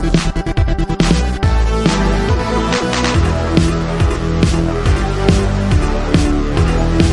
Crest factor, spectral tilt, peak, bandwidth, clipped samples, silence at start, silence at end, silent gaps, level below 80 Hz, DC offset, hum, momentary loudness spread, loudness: 14 dB; -6 dB/octave; 0 dBFS; 11.5 kHz; under 0.1%; 0 s; 0 s; none; -18 dBFS; under 0.1%; none; 2 LU; -15 LUFS